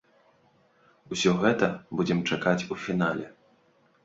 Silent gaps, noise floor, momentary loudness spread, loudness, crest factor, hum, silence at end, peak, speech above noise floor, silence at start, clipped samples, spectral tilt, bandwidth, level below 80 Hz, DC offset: none; -64 dBFS; 10 LU; -27 LUFS; 22 dB; none; 0.75 s; -8 dBFS; 38 dB; 1.1 s; under 0.1%; -5.5 dB/octave; 8 kHz; -62 dBFS; under 0.1%